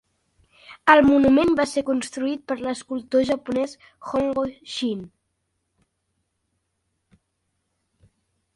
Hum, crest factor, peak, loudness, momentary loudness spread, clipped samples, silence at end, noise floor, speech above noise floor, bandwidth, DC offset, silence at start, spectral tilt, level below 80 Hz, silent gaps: none; 24 dB; 0 dBFS; -21 LUFS; 13 LU; under 0.1%; 3.5 s; -75 dBFS; 54 dB; 11.5 kHz; under 0.1%; 0.7 s; -4.5 dB/octave; -54 dBFS; none